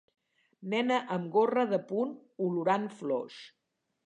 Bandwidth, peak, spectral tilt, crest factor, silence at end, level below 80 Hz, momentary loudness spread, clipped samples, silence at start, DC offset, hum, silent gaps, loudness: 9.8 kHz; -16 dBFS; -6.5 dB/octave; 16 dB; 0.55 s; -86 dBFS; 9 LU; under 0.1%; 0.6 s; under 0.1%; none; none; -31 LUFS